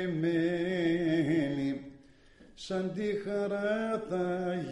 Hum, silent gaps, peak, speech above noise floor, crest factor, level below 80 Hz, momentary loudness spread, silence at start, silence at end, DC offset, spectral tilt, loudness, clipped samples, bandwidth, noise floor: none; none; -18 dBFS; 26 dB; 12 dB; -62 dBFS; 7 LU; 0 s; 0 s; under 0.1%; -7 dB/octave; -31 LUFS; under 0.1%; 11 kHz; -57 dBFS